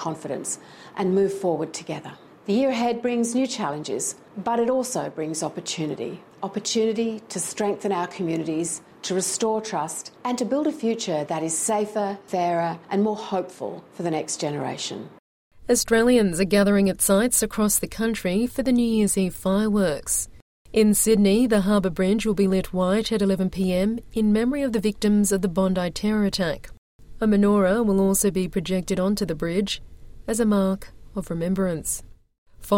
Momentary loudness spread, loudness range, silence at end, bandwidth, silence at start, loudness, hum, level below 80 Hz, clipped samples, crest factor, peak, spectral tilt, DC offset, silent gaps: 11 LU; 6 LU; 0 s; 16.5 kHz; 0 s; -23 LUFS; none; -46 dBFS; under 0.1%; 16 dB; -6 dBFS; -4.5 dB/octave; under 0.1%; 15.19-15.51 s, 20.42-20.65 s, 26.78-26.99 s, 32.38-32.46 s